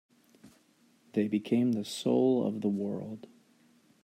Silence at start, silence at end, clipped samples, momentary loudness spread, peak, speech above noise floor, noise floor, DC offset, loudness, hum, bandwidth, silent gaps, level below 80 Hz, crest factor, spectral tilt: 0.45 s; 0.85 s; under 0.1%; 12 LU; -16 dBFS; 36 dB; -66 dBFS; under 0.1%; -30 LUFS; none; 14 kHz; none; -80 dBFS; 16 dB; -6.5 dB/octave